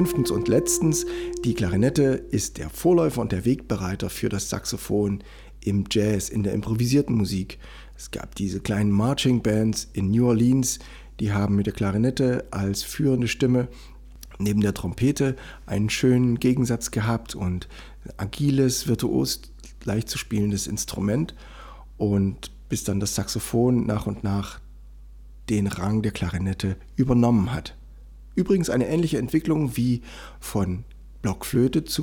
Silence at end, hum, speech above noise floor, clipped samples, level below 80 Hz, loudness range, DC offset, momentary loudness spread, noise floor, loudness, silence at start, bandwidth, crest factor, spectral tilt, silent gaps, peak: 0 s; none; 20 dB; under 0.1%; -42 dBFS; 4 LU; under 0.1%; 12 LU; -43 dBFS; -24 LUFS; 0 s; over 20 kHz; 16 dB; -5.5 dB/octave; none; -8 dBFS